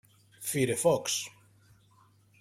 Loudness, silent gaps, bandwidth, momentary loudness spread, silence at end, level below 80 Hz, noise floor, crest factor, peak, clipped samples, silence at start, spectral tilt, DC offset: -29 LUFS; none; 16.5 kHz; 12 LU; 1.1 s; -68 dBFS; -63 dBFS; 20 dB; -14 dBFS; under 0.1%; 0.4 s; -3.5 dB/octave; under 0.1%